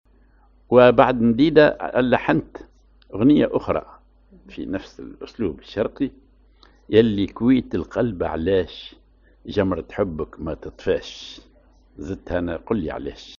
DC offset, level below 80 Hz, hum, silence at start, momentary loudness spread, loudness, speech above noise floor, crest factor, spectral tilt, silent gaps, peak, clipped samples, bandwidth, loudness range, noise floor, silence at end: under 0.1%; -44 dBFS; none; 0.7 s; 20 LU; -21 LUFS; 34 dB; 22 dB; -5.5 dB/octave; none; 0 dBFS; under 0.1%; 7 kHz; 10 LU; -55 dBFS; 0.05 s